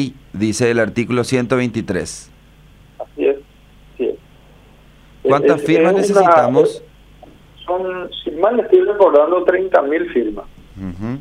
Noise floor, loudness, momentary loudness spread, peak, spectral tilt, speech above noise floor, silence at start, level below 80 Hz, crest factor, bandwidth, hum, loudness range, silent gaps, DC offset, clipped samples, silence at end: -45 dBFS; -16 LUFS; 18 LU; 0 dBFS; -6 dB/octave; 30 dB; 0 s; -46 dBFS; 16 dB; 12.5 kHz; none; 8 LU; none; under 0.1%; under 0.1%; 0 s